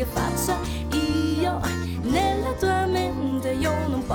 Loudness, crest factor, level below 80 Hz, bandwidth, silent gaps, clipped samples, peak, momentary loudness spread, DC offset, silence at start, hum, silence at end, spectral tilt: -24 LUFS; 14 dB; -36 dBFS; 19 kHz; none; under 0.1%; -10 dBFS; 4 LU; under 0.1%; 0 s; none; 0 s; -5.5 dB/octave